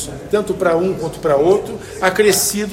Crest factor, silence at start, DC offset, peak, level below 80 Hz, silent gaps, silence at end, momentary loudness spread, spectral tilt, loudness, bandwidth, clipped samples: 16 dB; 0 s; under 0.1%; 0 dBFS; -44 dBFS; none; 0 s; 7 LU; -3.5 dB/octave; -16 LUFS; 16.5 kHz; under 0.1%